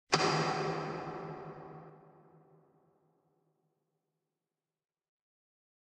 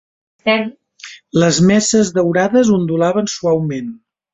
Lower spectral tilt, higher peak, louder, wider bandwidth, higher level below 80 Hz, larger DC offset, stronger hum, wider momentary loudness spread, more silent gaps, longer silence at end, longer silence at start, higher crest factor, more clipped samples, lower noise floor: about the same, -4 dB/octave vs -5 dB/octave; second, -12 dBFS vs -2 dBFS; second, -35 LUFS vs -15 LUFS; first, 10.5 kHz vs 8.4 kHz; second, -76 dBFS vs -50 dBFS; neither; neither; first, 22 LU vs 15 LU; neither; first, 3.75 s vs 0.35 s; second, 0.1 s vs 0.45 s; first, 28 dB vs 14 dB; neither; first, under -90 dBFS vs -38 dBFS